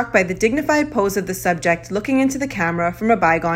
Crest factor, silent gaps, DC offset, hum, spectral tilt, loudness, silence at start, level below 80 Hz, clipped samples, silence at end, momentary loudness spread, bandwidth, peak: 16 dB; none; under 0.1%; none; -5.5 dB/octave; -19 LUFS; 0 s; -44 dBFS; under 0.1%; 0 s; 5 LU; 16.5 kHz; -2 dBFS